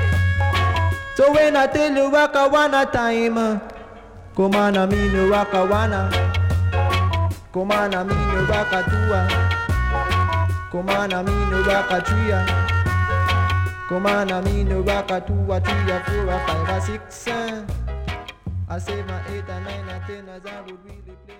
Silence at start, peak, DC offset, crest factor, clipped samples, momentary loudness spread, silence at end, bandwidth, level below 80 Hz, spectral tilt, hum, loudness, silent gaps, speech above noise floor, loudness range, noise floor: 0 s; -6 dBFS; under 0.1%; 14 dB; under 0.1%; 13 LU; 0.05 s; 15.5 kHz; -32 dBFS; -6.5 dB/octave; none; -20 LUFS; none; 20 dB; 9 LU; -40 dBFS